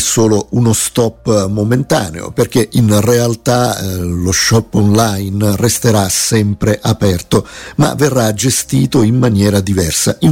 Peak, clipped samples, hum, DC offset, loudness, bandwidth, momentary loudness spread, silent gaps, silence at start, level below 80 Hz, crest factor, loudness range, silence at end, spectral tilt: 0 dBFS; under 0.1%; none; under 0.1%; -12 LUFS; 17 kHz; 5 LU; none; 0 s; -36 dBFS; 12 dB; 1 LU; 0 s; -5 dB/octave